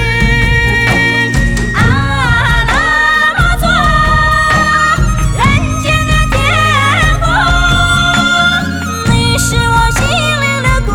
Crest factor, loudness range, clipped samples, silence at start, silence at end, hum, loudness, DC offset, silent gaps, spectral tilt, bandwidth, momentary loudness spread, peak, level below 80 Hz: 10 dB; 1 LU; under 0.1%; 0 s; 0 s; none; -10 LUFS; under 0.1%; none; -4 dB/octave; 18 kHz; 3 LU; 0 dBFS; -18 dBFS